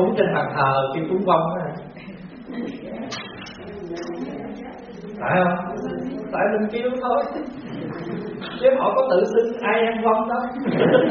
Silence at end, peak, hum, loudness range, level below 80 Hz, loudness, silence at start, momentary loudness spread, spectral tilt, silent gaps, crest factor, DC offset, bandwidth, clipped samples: 0 s; -4 dBFS; none; 11 LU; -56 dBFS; -22 LUFS; 0 s; 17 LU; -5 dB/octave; none; 20 dB; under 0.1%; 6.6 kHz; under 0.1%